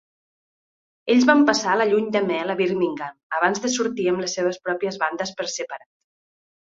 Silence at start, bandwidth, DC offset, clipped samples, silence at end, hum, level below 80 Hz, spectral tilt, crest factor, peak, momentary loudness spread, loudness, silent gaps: 1.05 s; 7.8 kHz; under 0.1%; under 0.1%; 0.9 s; none; -68 dBFS; -3.5 dB/octave; 20 dB; -2 dBFS; 12 LU; -21 LUFS; 3.23-3.30 s